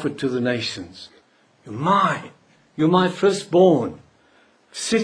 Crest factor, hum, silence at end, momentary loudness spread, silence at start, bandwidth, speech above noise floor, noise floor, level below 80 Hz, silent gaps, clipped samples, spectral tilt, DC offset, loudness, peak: 18 dB; none; 0 s; 20 LU; 0 s; 10.5 kHz; 37 dB; -57 dBFS; -62 dBFS; none; under 0.1%; -5.5 dB/octave; under 0.1%; -20 LUFS; -2 dBFS